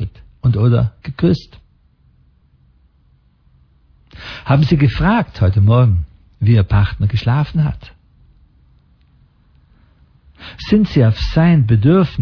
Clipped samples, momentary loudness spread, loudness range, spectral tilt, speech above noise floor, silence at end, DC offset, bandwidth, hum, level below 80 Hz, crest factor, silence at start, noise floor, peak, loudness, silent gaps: under 0.1%; 18 LU; 11 LU; -9 dB/octave; 41 dB; 0 s; under 0.1%; 5.4 kHz; none; -32 dBFS; 14 dB; 0 s; -54 dBFS; -2 dBFS; -15 LUFS; none